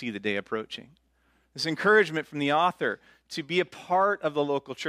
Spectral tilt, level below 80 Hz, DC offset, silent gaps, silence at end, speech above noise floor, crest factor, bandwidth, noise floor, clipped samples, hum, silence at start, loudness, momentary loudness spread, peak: -4.5 dB/octave; -72 dBFS; under 0.1%; none; 0 s; 41 dB; 18 dB; 14 kHz; -68 dBFS; under 0.1%; none; 0 s; -26 LUFS; 17 LU; -10 dBFS